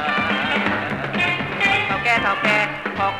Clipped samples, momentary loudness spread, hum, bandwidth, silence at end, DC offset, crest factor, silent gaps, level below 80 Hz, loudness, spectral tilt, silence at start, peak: under 0.1%; 5 LU; none; 15.5 kHz; 0 s; under 0.1%; 18 dB; none; -48 dBFS; -19 LUFS; -4.5 dB/octave; 0 s; -2 dBFS